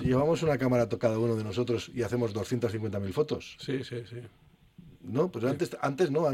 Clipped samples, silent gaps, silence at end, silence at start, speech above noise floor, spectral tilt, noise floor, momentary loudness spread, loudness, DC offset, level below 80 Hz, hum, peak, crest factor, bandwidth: under 0.1%; none; 0 s; 0 s; 25 dB; -7 dB/octave; -54 dBFS; 9 LU; -30 LUFS; under 0.1%; -56 dBFS; none; -12 dBFS; 18 dB; 15.5 kHz